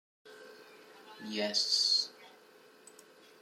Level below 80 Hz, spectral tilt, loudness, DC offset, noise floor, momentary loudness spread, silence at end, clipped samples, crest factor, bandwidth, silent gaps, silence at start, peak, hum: under -90 dBFS; -1 dB/octave; -30 LUFS; under 0.1%; -60 dBFS; 27 LU; 1.15 s; under 0.1%; 20 dB; 16.5 kHz; none; 0.25 s; -16 dBFS; none